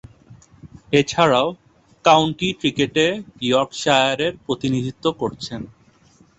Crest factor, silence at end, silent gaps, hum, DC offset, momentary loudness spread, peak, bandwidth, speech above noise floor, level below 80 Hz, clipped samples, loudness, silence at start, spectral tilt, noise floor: 20 dB; 0.75 s; none; none; under 0.1%; 11 LU; -2 dBFS; 8.4 kHz; 35 dB; -52 dBFS; under 0.1%; -19 LUFS; 0.3 s; -4.5 dB/octave; -54 dBFS